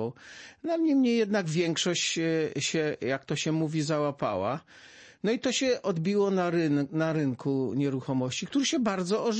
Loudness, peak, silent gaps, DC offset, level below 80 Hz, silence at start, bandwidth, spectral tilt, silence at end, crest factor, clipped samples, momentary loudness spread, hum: -28 LUFS; -16 dBFS; none; under 0.1%; -70 dBFS; 0 s; 8.8 kHz; -5 dB/octave; 0 s; 12 dB; under 0.1%; 6 LU; none